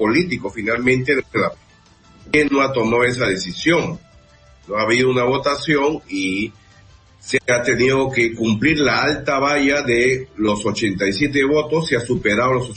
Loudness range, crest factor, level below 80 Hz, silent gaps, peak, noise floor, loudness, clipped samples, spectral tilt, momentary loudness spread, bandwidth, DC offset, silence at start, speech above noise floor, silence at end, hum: 3 LU; 16 dB; -46 dBFS; none; -4 dBFS; -50 dBFS; -18 LUFS; under 0.1%; -5 dB/octave; 6 LU; 8.8 kHz; under 0.1%; 0 s; 32 dB; 0 s; none